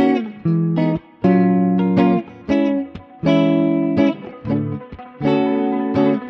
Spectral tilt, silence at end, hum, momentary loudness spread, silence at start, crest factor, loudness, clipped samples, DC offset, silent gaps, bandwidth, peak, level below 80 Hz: -9.5 dB/octave; 0 s; none; 8 LU; 0 s; 14 dB; -18 LUFS; under 0.1%; under 0.1%; none; 6.2 kHz; -2 dBFS; -50 dBFS